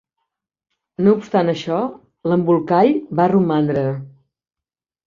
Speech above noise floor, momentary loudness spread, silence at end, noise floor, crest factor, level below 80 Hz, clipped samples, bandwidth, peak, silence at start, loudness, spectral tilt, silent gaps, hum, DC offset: 72 dB; 11 LU; 1 s; -89 dBFS; 16 dB; -60 dBFS; under 0.1%; 7.2 kHz; -2 dBFS; 1 s; -18 LUFS; -8.5 dB/octave; none; none; under 0.1%